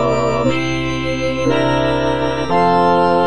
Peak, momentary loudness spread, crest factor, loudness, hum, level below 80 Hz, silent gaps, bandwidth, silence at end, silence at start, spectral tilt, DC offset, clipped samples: -2 dBFS; 6 LU; 14 dB; -16 LUFS; none; -36 dBFS; none; 10 kHz; 0 s; 0 s; -6 dB/octave; 3%; under 0.1%